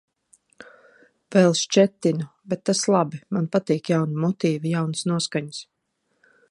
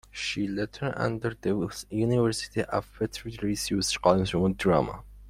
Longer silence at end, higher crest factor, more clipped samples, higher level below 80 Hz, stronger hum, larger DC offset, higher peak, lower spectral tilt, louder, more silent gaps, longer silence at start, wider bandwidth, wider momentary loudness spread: first, 0.9 s vs 0 s; about the same, 20 dB vs 22 dB; neither; second, -70 dBFS vs -50 dBFS; neither; neither; first, -2 dBFS vs -6 dBFS; about the same, -5 dB/octave vs -5 dB/octave; first, -22 LUFS vs -28 LUFS; neither; first, 0.6 s vs 0.15 s; second, 11.5 kHz vs 16 kHz; about the same, 10 LU vs 9 LU